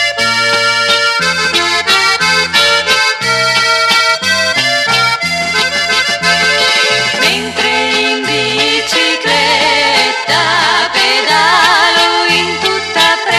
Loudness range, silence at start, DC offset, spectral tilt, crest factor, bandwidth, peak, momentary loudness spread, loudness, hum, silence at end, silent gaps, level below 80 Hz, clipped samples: 1 LU; 0 s; under 0.1%; -1.5 dB/octave; 12 dB; 16 kHz; 0 dBFS; 3 LU; -9 LUFS; none; 0 s; none; -48 dBFS; under 0.1%